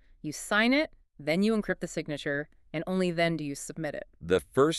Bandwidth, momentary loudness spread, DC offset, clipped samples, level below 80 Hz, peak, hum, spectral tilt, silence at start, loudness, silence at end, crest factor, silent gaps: 13.5 kHz; 13 LU; under 0.1%; under 0.1%; -56 dBFS; -12 dBFS; none; -5 dB/octave; 0.25 s; -30 LUFS; 0 s; 18 dB; none